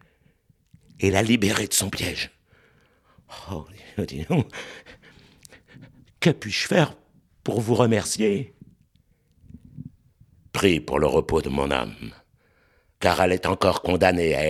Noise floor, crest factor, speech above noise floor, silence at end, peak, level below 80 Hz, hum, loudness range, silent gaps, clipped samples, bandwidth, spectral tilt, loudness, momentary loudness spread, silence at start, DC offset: -63 dBFS; 24 dB; 40 dB; 0 s; -2 dBFS; -46 dBFS; none; 8 LU; none; under 0.1%; 16 kHz; -4.5 dB/octave; -23 LUFS; 20 LU; 1 s; under 0.1%